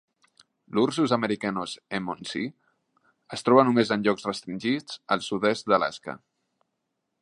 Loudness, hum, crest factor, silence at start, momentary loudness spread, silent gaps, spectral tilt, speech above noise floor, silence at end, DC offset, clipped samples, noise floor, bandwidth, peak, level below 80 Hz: -26 LUFS; none; 24 dB; 0.7 s; 13 LU; none; -5.5 dB/octave; 55 dB; 1.05 s; under 0.1%; under 0.1%; -80 dBFS; 11.5 kHz; -4 dBFS; -68 dBFS